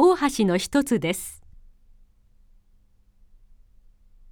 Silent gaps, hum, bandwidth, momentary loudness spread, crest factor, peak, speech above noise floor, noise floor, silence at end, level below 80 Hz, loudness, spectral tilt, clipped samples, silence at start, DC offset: none; none; 19 kHz; 15 LU; 18 dB; -8 dBFS; 34 dB; -58 dBFS; 2.95 s; -52 dBFS; -23 LUFS; -5 dB/octave; under 0.1%; 0 s; under 0.1%